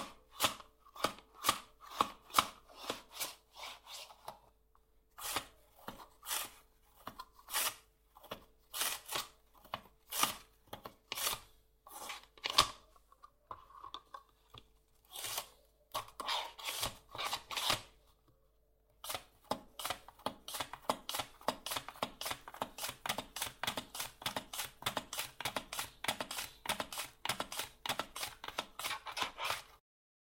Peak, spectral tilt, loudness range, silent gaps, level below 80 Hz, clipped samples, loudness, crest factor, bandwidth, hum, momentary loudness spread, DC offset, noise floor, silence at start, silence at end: -8 dBFS; -1 dB/octave; 6 LU; none; -66 dBFS; under 0.1%; -39 LUFS; 36 dB; 16.5 kHz; none; 16 LU; under 0.1%; -72 dBFS; 0 s; 0.5 s